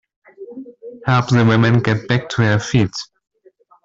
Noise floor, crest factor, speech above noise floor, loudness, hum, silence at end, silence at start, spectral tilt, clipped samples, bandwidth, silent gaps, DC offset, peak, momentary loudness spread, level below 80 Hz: -52 dBFS; 16 dB; 37 dB; -16 LUFS; none; 0.8 s; 0.4 s; -6.5 dB/octave; under 0.1%; 7.6 kHz; none; under 0.1%; -2 dBFS; 22 LU; -48 dBFS